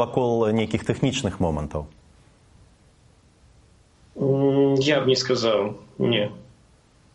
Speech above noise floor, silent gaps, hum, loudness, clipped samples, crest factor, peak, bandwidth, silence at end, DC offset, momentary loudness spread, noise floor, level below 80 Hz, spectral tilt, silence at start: 33 dB; none; none; -23 LUFS; under 0.1%; 18 dB; -6 dBFS; 11 kHz; 0.7 s; under 0.1%; 11 LU; -56 dBFS; -48 dBFS; -5.5 dB/octave; 0 s